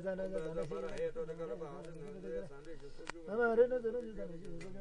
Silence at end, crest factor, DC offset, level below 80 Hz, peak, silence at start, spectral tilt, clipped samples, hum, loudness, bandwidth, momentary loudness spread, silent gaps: 0 s; 20 dB; under 0.1%; -54 dBFS; -20 dBFS; 0 s; -6.5 dB/octave; under 0.1%; none; -39 LUFS; 10.5 kHz; 17 LU; none